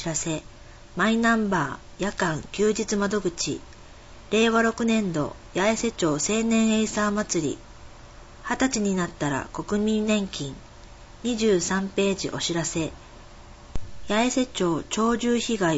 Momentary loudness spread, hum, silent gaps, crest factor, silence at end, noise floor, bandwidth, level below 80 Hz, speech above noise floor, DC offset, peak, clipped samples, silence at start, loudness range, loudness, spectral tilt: 11 LU; none; none; 16 dB; 0 s; -45 dBFS; 8 kHz; -46 dBFS; 21 dB; under 0.1%; -8 dBFS; under 0.1%; 0 s; 3 LU; -25 LUFS; -4 dB/octave